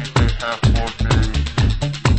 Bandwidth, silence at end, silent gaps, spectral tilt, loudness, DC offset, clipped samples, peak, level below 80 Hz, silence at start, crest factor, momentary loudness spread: 8.8 kHz; 0 s; none; -5.5 dB/octave; -19 LUFS; under 0.1%; under 0.1%; 0 dBFS; -22 dBFS; 0 s; 16 dB; 2 LU